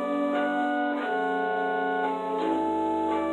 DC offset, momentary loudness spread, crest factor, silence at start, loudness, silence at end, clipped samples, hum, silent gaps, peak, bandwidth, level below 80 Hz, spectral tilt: under 0.1%; 1 LU; 12 dB; 0 s; -27 LUFS; 0 s; under 0.1%; none; none; -14 dBFS; 10.5 kHz; -68 dBFS; -6 dB/octave